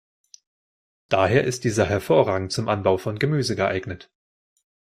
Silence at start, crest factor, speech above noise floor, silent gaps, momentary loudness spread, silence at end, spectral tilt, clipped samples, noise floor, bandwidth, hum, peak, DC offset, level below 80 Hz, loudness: 1.1 s; 20 dB; over 68 dB; none; 6 LU; 0.8 s; -5.5 dB/octave; under 0.1%; under -90 dBFS; 15.5 kHz; none; -4 dBFS; under 0.1%; -54 dBFS; -22 LUFS